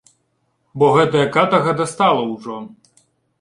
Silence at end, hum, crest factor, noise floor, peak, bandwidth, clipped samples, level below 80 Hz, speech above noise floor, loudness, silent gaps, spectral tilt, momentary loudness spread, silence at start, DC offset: 0.7 s; none; 16 dB; -67 dBFS; -2 dBFS; 11.5 kHz; under 0.1%; -58 dBFS; 51 dB; -16 LUFS; none; -5.5 dB/octave; 18 LU; 0.75 s; under 0.1%